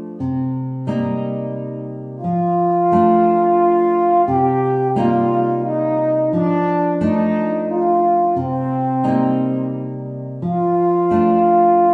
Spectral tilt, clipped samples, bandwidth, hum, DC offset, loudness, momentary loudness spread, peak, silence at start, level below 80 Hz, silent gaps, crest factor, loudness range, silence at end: -10.5 dB/octave; under 0.1%; 4.6 kHz; none; under 0.1%; -17 LUFS; 11 LU; -2 dBFS; 0 s; -56 dBFS; none; 14 dB; 3 LU; 0 s